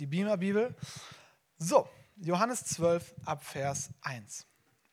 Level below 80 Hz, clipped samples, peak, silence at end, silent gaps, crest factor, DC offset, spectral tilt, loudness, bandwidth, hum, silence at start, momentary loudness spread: -70 dBFS; under 0.1%; -10 dBFS; 0.5 s; none; 24 dB; under 0.1%; -5 dB/octave; -32 LUFS; 16 kHz; none; 0 s; 17 LU